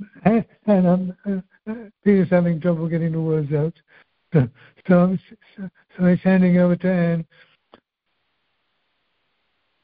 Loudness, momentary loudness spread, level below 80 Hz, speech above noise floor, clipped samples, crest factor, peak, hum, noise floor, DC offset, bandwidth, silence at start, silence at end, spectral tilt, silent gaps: -20 LUFS; 17 LU; -54 dBFS; 55 dB; under 0.1%; 18 dB; -4 dBFS; none; -74 dBFS; under 0.1%; 4.7 kHz; 0 s; 2.6 s; -9 dB/octave; none